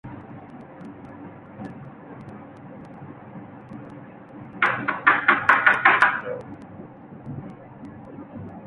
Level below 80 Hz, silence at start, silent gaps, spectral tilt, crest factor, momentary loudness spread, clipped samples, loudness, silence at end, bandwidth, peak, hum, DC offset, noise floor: -60 dBFS; 0.05 s; none; -5.5 dB/octave; 24 dB; 25 LU; under 0.1%; -19 LUFS; 0 s; 11.5 kHz; -2 dBFS; none; under 0.1%; -42 dBFS